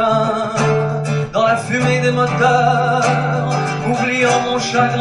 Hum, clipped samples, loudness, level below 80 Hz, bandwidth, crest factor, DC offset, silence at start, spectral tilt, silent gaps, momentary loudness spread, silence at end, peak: none; under 0.1%; -16 LUFS; -48 dBFS; 11.5 kHz; 14 dB; under 0.1%; 0 s; -5.5 dB/octave; none; 5 LU; 0 s; -2 dBFS